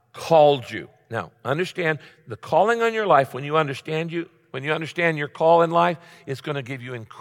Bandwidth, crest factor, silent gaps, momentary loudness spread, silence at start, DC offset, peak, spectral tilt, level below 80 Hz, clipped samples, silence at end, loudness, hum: 16.5 kHz; 18 dB; none; 17 LU; 0.15 s; under 0.1%; -4 dBFS; -6 dB/octave; -70 dBFS; under 0.1%; 0 s; -22 LUFS; none